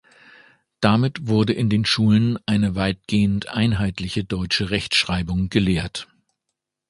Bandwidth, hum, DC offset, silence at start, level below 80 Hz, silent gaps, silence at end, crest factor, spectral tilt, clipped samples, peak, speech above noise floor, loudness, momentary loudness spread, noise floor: 11.5 kHz; none; under 0.1%; 0.8 s; -40 dBFS; none; 0.85 s; 20 dB; -6 dB/octave; under 0.1%; 0 dBFS; 60 dB; -21 LUFS; 7 LU; -81 dBFS